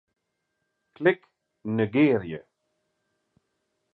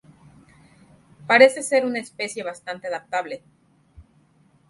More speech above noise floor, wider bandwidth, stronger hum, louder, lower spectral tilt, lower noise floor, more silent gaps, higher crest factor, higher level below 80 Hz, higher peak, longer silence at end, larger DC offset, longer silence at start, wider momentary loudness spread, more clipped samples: first, 55 dB vs 38 dB; second, 4.5 kHz vs 11.5 kHz; neither; second, -25 LUFS vs -21 LUFS; first, -9.5 dB/octave vs -3 dB/octave; first, -79 dBFS vs -59 dBFS; neither; about the same, 22 dB vs 24 dB; about the same, -64 dBFS vs -62 dBFS; second, -8 dBFS vs 0 dBFS; first, 1.55 s vs 0.7 s; neither; second, 1 s vs 1.25 s; about the same, 17 LU vs 19 LU; neither